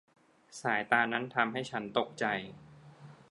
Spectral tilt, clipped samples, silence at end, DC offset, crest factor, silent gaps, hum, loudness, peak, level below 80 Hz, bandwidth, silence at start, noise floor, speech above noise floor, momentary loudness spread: -4.5 dB/octave; under 0.1%; 0.15 s; under 0.1%; 26 dB; none; none; -32 LUFS; -10 dBFS; -76 dBFS; 11.5 kHz; 0.5 s; -54 dBFS; 21 dB; 9 LU